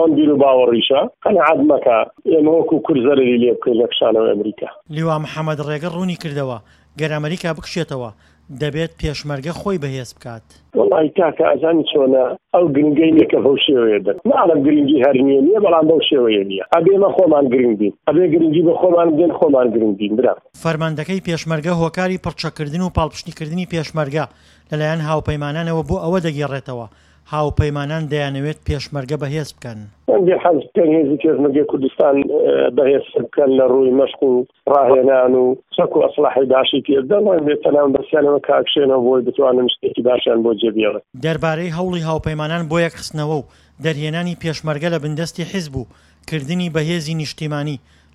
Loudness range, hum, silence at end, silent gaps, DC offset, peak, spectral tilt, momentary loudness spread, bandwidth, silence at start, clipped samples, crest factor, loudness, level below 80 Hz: 9 LU; none; 0.35 s; none; under 0.1%; 0 dBFS; -6.5 dB/octave; 11 LU; 12 kHz; 0 s; under 0.1%; 16 dB; -16 LUFS; -42 dBFS